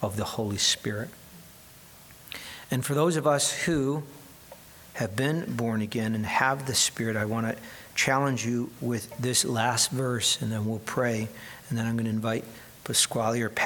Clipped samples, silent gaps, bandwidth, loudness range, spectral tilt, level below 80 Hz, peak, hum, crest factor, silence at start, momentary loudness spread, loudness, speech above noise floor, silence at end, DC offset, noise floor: under 0.1%; none; 19 kHz; 3 LU; -3.5 dB/octave; -60 dBFS; -8 dBFS; none; 22 dB; 0 s; 18 LU; -27 LUFS; 23 dB; 0 s; under 0.1%; -51 dBFS